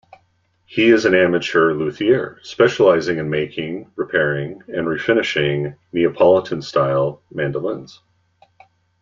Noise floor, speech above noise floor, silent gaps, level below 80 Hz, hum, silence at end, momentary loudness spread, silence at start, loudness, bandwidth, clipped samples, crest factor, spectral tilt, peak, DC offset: -62 dBFS; 45 dB; none; -56 dBFS; none; 1.15 s; 12 LU; 0.7 s; -18 LUFS; 7.6 kHz; under 0.1%; 16 dB; -6 dB/octave; -2 dBFS; under 0.1%